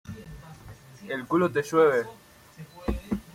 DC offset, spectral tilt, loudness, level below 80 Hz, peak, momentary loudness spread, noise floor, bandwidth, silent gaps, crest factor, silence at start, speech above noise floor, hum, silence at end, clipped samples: under 0.1%; -6.5 dB/octave; -26 LUFS; -44 dBFS; -10 dBFS; 25 LU; -48 dBFS; 16 kHz; none; 20 dB; 0.05 s; 24 dB; none; 0.15 s; under 0.1%